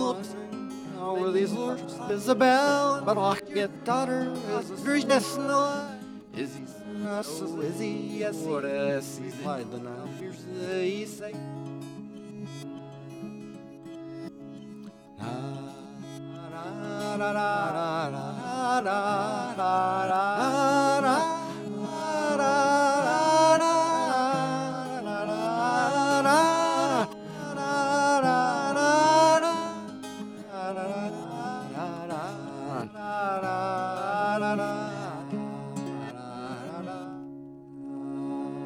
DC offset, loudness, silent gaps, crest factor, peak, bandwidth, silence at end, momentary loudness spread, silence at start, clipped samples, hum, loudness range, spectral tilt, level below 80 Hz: under 0.1%; -27 LUFS; none; 20 dB; -8 dBFS; 16.5 kHz; 0 s; 18 LU; 0 s; under 0.1%; none; 13 LU; -4.5 dB/octave; -74 dBFS